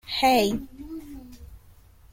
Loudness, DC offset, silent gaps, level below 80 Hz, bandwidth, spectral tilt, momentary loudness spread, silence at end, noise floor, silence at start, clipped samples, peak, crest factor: -23 LUFS; under 0.1%; none; -48 dBFS; 16.5 kHz; -4 dB/octave; 24 LU; 0.55 s; -52 dBFS; 0.05 s; under 0.1%; -10 dBFS; 18 dB